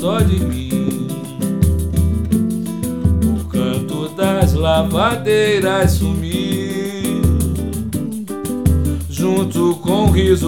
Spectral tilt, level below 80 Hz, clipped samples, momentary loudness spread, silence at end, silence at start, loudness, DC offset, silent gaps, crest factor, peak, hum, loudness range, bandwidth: -6.5 dB/octave; -26 dBFS; under 0.1%; 8 LU; 0 s; 0 s; -17 LUFS; under 0.1%; none; 16 dB; 0 dBFS; none; 3 LU; 17.5 kHz